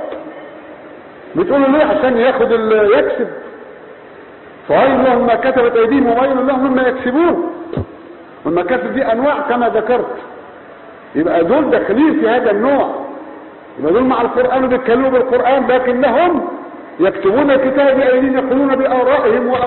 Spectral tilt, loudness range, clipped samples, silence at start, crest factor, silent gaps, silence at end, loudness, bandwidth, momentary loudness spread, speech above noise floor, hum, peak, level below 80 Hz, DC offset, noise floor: -11 dB/octave; 3 LU; under 0.1%; 0 s; 14 dB; none; 0 s; -13 LUFS; 4.3 kHz; 17 LU; 24 dB; none; 0 dBFS; -46 dBFS; under 0.1%; -36 dBFS